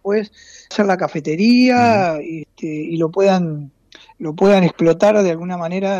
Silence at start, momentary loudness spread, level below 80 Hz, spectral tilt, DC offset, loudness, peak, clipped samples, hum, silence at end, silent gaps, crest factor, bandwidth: 0.05 s; 16 LU; -58 dBFS; -6.5 dB/octave; under 0.1%; -16 LUFS; -4 dBFS; under 0.1%; none; 0 s; none; 12 dB; 8.2 kHz